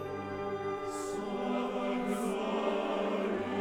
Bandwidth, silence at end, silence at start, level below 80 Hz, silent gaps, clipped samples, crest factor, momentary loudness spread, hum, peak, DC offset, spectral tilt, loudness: 17.5 kHz; 0 s; 0 s; -62 dBFS; none; under 0.1%; 16 dB; 5 LU; none; -18 dBFS; under 0.1%; -5.5 dB/octave; -34 LUFS